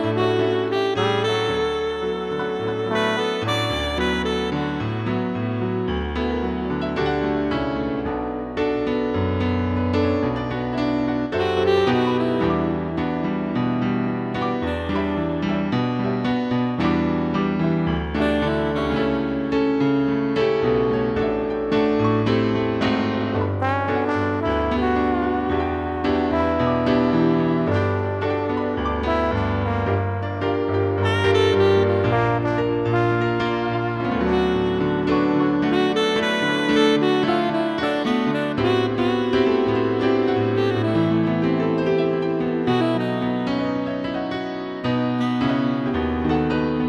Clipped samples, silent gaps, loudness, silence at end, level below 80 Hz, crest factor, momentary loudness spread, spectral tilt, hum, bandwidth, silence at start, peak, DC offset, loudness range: under 0.1%; none; -21 LUFS; 0 s; -40 dBFS; 14 dB; 5 LU; -7 dB/octave; none; 11.5 kHz; 0 s; -6 dBFS; under 0.1%; 4 LU